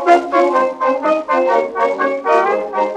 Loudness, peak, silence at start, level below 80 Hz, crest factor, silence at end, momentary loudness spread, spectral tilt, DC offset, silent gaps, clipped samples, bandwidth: -15 LUFS; -2 dBFS; 0 s; -62 dBFS; 14 dB; 0 s; 5 LU; -4.5 dB/octave; under 0.1%; none; under 0.1%; 9.8 kHz